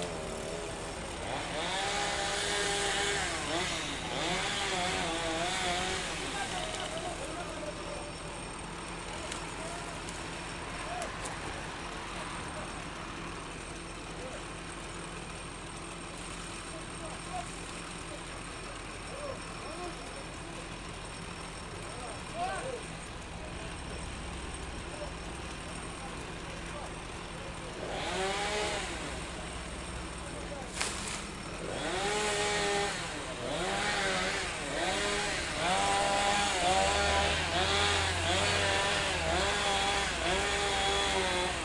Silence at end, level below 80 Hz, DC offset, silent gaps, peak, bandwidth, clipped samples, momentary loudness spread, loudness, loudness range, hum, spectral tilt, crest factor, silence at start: 0 s; -48 dBFS; under 0.1%; none; -12 dBFS; 11.5 kHz; under 0.1%; 13 LU; -34 LUFS; 12 LU; none; -2.5 dB/octave; 22 dB; 0 s